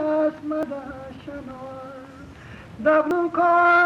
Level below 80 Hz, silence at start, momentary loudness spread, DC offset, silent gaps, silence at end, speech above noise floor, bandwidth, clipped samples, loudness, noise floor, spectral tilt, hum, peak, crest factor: -54 dBFS; 0 s; 23 LU; under 0.1%; none; 0 s; 21 dB; 10.5 kHz; under 0.1%; -21 LUFS; -42 dBFS; -6.5 dB/octave; none; -8 dBFS; 14 dB